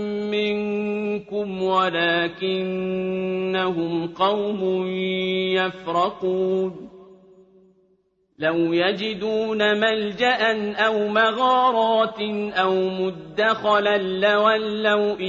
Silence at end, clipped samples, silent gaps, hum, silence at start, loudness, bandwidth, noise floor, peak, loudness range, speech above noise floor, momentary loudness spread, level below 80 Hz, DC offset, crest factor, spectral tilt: 0 s; under 0.1%; none; none; 0 s; -22 LUFS; 7.4 kHz; -65 dBFS; -6 dBFS; 5 LU; 43 dB; 7 LU; -62 dBFS; under 0.1%; 16 dB; -6 dB/octave